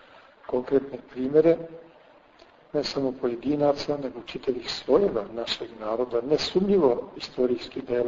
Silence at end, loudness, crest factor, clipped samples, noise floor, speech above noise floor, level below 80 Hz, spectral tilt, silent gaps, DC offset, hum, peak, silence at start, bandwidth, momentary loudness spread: 0 s; -26 LUFS; 20 dB; under 0.1%; -55 dBFS; 29 dB; -56 dBFS; -6 dB/octave; none; under 0.1%; none; -8 dBFS; 0.5 s; 7.6 kHz; 11 LU